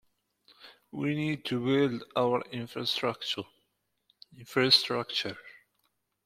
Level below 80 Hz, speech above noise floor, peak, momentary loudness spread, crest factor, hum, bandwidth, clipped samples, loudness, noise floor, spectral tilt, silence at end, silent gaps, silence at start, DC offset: -70 dBFS; 48 dB; -8 dBFS; 16 LU; 24 dB; none; 15.5 kHz; under 0.1%; -29 LUFS; -78 dBFS; -5 dB/octave; 0.75 s; none; 0.6 s; under 0.1%